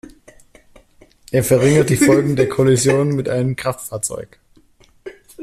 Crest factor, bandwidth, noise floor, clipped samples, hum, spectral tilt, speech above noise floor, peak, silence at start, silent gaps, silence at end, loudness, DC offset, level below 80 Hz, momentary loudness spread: 16 dB; 15 kHz; -52 dBFS; under 0.1%; none; -5.5 dB/octave; 36 dB; -2 dBFS; 1.3 s; none; 0 s; -16 LUFS; under 0.1%; -48 dBFS; 16 LU